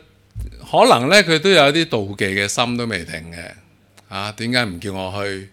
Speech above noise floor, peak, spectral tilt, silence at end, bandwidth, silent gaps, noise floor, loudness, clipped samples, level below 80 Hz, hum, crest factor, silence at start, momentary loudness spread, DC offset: 31 dB; 0 dBFS; -4 dB/octave; 0.05 s; 18 kHz; none; -49 dBFS; -17 LUFS; under 0.1%; -44 dBFS; none; 18 dB; 0.35 s; 22 LU; under 0.1%